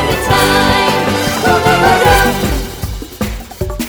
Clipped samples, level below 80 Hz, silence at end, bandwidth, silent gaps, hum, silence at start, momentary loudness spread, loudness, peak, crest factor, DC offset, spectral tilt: under 0.1%; -24 dBFS; 0 s; over 20 kHz; none; none; 0 s; 14 LU; -11 LUFS; 0 dBFS; 12 dB; under 0.1%; -4 dB/octave